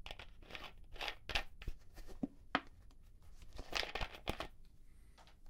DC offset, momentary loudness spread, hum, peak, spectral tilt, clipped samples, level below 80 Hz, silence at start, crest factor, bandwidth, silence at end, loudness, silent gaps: under 0.1%; 24 LU; none; -16 dBFS; -3.5 dB/octave; under 0.1%; -54 dBFS; 0 s; 32 dB; 16.5 kHz; 0 s; -45 LUFS; none